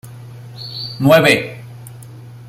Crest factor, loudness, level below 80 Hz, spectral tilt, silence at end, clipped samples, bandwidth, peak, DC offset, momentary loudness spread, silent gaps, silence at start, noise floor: 18 dB; -14 LUFS; -52 dBFS; -5 dB/octave; 0 s; under 0.1%; 16 kHz; 0 dBFS; under 0.1%; 25 LU; none; 0.05 s; -36 dBFS